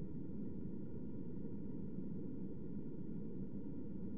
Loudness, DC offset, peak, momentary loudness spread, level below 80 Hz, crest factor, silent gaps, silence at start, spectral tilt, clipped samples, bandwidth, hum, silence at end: -48 LUFS; 0.6%; -32 dBFS; 1 LU; -62 dBFS; 12 dB; none; 0 s; -12.5 dB/octave; under 0.1%; 3.4 kHz; none; 0 s